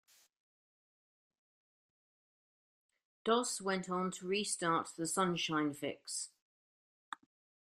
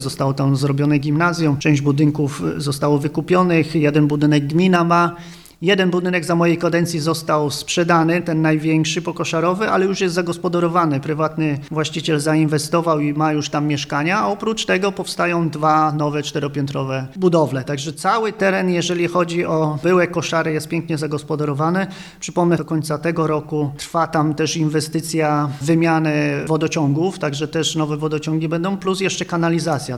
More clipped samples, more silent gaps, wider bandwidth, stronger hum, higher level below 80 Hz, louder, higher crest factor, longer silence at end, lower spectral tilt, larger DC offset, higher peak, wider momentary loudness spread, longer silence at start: neither; first, 6.42-7.12 s vs none; first, 15.5 kHz vs 13.5 kHz; neither; second, -82 dBFS vs -52 dBFS; second, -36 LUFS vs -18 LUFS; first, 24 dB vs 16 dB; first, 0.6 s vs 0 s; second, -3.5 dB/octave vs -5.5 dB/octave; neither; second, -18 dBFS vs -2 dBFS; first, 15 LU vs 6 LU; first, 3.25 s vs 0 s